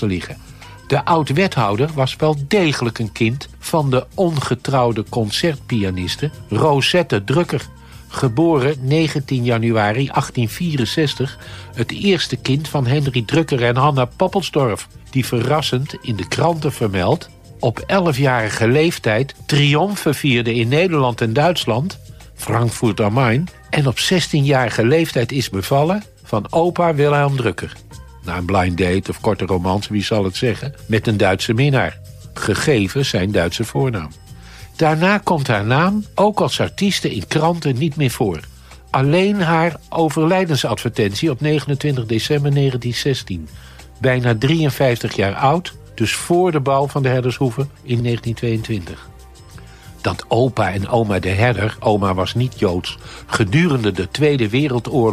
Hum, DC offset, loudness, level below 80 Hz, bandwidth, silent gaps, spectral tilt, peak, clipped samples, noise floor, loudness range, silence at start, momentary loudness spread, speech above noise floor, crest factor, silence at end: none; under 0.1%; -18 LUFS; -44 dBFS; 15.5 kHz; none; -6 dB/octave; -4 dBFS; under 0.1%; -39 dBFS; 2 LU; 0 s; 9 LU; 22 dB; 14 dB; 0 s